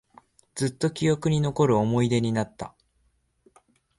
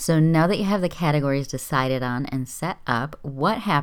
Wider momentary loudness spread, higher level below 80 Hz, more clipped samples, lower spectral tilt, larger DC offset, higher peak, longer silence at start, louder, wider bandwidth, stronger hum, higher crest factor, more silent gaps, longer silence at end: first, 16 LU vs 10 LU; second, -56 dBFS vs -48 dBFS; neither; about the same, -6.5 dB/octave vs -6 dB/octave; neither; second, -10 dBFS vs -6 dBFS; first, 0.55 s vs 0 s; about the same, -25 LUFS vs -23 LUFS; second, 11.5 kHz vs 18 kHz; neither; about the same, 16 dB vs 18 dB; neither; first, 1.3 s vs 0 s